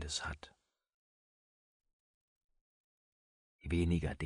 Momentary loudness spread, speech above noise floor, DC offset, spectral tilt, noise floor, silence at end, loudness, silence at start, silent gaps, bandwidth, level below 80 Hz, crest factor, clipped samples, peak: 17 LU; over 54 dB; under 0.1%; -5 dB/octave; under -90 dBFS; 0 s; -37 LUFS; 0 s; 0.94-1.80 s, 1.93-2.49 s, 2.61-3.59 s; 10.5 kHz; -52 dBFS; 20 dB; under 0.1%; -22 dBFS